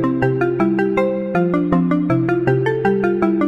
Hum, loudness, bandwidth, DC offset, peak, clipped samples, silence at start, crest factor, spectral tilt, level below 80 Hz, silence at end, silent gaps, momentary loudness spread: none; -17 LUFS; 7.2 kHz; under 0.1%; -4 dBFS; under 0.1%; 0 s; 12 dB; -9.5 dB/octave; -46 dBFS; 0 s; none; 1 LU